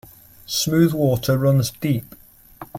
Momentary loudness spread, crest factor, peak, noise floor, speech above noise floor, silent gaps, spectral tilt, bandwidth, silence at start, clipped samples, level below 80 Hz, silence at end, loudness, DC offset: 7 LU; 16 dB; -6 dBFS; -42 dBFS; 24 dB; none; -5.5 dB/octave; 17 kHz; 0.5 s; under 0.1%; -50 dBFS; 0 s; -20 LUFS; under 0.1%